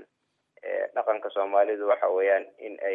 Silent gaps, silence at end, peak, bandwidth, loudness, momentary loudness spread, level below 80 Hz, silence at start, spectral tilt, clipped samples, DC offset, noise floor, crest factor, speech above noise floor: none; 0 s; -10 dBFS; 3.7 kHz; -26 LUFS; 10 LU; under -90 dBFS; 0 s; -5.5 dB/octave; under 0.1%; under 0.1%; -77 dBFS; 18 dB; 51 dB